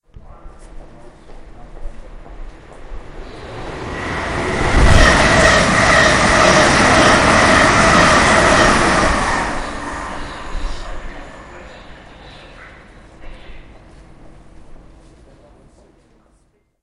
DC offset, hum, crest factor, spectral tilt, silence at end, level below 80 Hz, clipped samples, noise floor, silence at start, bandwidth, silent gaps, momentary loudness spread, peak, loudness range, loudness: under 0.1%; none; 16 dB; -4 dB/octave; 2.05 s; -26 dBFS; under 0.1%; -58 dBFS; 0.25 s; 11.5 kHz; none; 22 LU; 0 dBFS; 21 LU; -12 LUFS